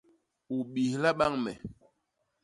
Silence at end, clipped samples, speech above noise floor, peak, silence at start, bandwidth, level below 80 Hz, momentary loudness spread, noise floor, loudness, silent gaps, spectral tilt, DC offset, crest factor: 0.7 s; under 0.1%; 49 dB; -12 dBFS; 0.5 s; 11.5 kHz; -62 dBFS; 15 LU; -79 dBFS; -30 LUFS; none; -6 dB/octave; under 0.1%; 20 dB